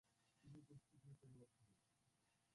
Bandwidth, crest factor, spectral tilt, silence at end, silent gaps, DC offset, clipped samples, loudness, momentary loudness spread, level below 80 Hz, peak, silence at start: 11 kHz; 14 dB; -6.5 dB/octave; 0 s; none; under 0.1%; under 0.1%; -67 LUFS; 3 LU; -90 dBFS; -54 dBFS; 0.05 s